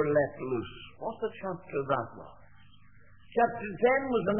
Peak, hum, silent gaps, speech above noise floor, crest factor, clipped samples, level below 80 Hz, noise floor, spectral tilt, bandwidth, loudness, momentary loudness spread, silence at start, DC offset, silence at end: -12 dBFS; none; none; 29 dB; 18 dB; under 0.1%; -60 dBFS; -59 dBFS; -10 dB/octave; 3.4 kHz; -31 LUFS; 15 LU; 0 s; 0.2%; 0 s